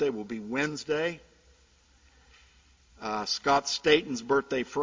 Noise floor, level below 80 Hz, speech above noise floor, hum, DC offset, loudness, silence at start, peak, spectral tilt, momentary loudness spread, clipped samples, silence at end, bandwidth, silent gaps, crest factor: -62 dBFS; -62 dBFS; 34 dB; none; under 0.1%; -28 LUFS; 0 s; -8 dBFS; -3.5 dB/octave; 11 LU; under 0.1%; 0 s; 7.6 kHz; none; 24 dB